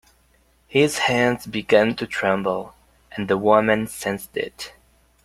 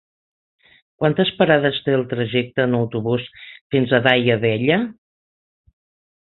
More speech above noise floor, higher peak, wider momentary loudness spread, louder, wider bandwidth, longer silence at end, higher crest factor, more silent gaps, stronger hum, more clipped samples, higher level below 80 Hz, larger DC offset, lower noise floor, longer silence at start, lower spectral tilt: second, 39 dB vs over 72 dB; about the same, -2 dBFS vs -2 dBFS; first, 14 LU vs 8 LU; about the same, -21 LUFS vs -19 LUFS; first, 16 kHz vs 4.3 kHz; second, 0.55 s vs 1.35 s; about the same, 20 dB vs 20 dB; second, none vs 3.61-3.70 s; neither; neither; about the same, -56 dBFS vs -56 dBFS; neither; second, -60 dBFS vs under -90 dBFS; second, 0.7 s vs 1 s; second, -4.5 dB/octave vs -9.5 dB/octave